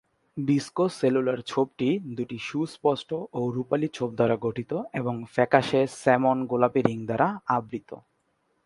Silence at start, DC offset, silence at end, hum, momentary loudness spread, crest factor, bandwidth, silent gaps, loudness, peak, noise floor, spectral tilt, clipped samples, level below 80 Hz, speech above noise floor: 0.35 s; under 0.1%; 0.65 s; none; 10 LU; 24 dB; 11.5 kHz; none; -26 LUFS; -2 dBFS; -72 dBFS; -6.5 dB/octave; under 0.1%; -64 dBFS; 46 dB